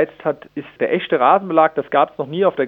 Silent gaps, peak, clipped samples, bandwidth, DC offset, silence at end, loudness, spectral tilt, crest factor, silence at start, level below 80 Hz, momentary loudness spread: none; 0 dBFS; under 0.1%; 4.3 kHz; under 0.1%; 0 s; -17 LUFS; -8.5 dB/octave; 18 dB; 0 s; -66 dBFS; 10 LU